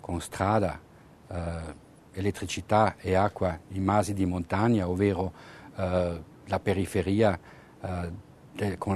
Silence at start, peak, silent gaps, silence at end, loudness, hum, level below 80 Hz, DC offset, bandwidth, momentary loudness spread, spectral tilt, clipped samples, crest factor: 0.05 s; -8 dBFS; none; 0 s; -28 LUFS; none; -50 dBFS; under 0.1%; 13.5 kHz; 16 LU; -6.5 dB/octave; under 0.1%; 20 dB